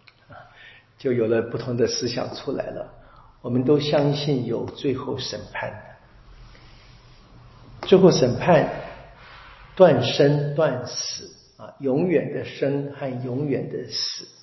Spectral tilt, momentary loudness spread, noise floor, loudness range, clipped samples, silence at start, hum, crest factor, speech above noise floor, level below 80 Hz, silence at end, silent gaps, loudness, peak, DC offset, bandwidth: -6 dB/octave; 17 LU; -49 dBFS; 7 LU; under 0.1%; 0.3 s; none; 22 dB; 27 dB; -54 dBFS; 0.15 s; none; -22 LUFS; -2 dBFS; under 0.1%; 6.2 kHz